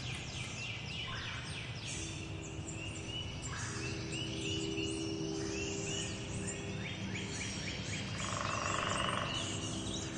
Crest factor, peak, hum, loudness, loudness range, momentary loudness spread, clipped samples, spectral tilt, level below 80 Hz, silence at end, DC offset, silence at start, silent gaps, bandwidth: 20 dB; -20 dBFS; none; -39 LUFS; 4 LU; 6 LU; under 0.1%; -3.5 dB/octave; -56 dBFS; 0 s; under 0.1%; 0 s; none; 11.5 kHz